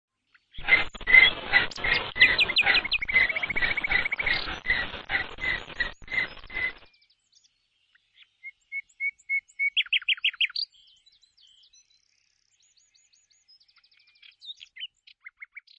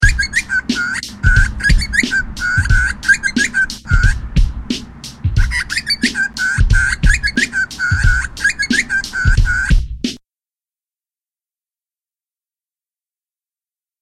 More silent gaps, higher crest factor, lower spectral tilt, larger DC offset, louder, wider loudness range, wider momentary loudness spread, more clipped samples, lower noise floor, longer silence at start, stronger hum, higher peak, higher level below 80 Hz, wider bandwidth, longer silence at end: neither; first, 24 dB vs 16 dB; about the same, -2.5 dB/octave vs -3.5 dB/octave; neither; second, -23 LUFS vs -16 LUFS; first, 15 LU vs 6 LU; first, 22 LU vs 7 LU; neither; second, -70 dBFS vs under -90 dBFS; first, 0.55 s vs 0 s; neither; second, -4 dBFS vs 0 dBFS; second, -48 dBFS vs -20 dBFS; second, 8.6 kHz vs 13 kHz; second, 0.2 s vs 3.85 s